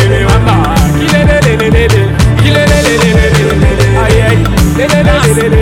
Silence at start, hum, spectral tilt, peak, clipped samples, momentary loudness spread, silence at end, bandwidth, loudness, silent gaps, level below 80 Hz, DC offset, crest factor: 0 s; none; -5.5 dB/octave; 0 dBFS; 0.3%; 2 LU; 0 s; 16.5 kHz; -8 LUFS; none; -14 dBFS; under 0.1%; 6 dB